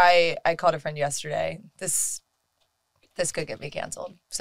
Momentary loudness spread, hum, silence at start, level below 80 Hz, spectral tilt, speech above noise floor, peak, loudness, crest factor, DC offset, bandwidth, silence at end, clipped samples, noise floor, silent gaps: 12 LU; none; 0 s; -58 dBFS; -2 dB/octave; 46 dB; -4 dBFS; -26 LUFS; 22 dB; under 0.1%; 16 kHz; 0 s; under 0.1%; -73 dBFS; none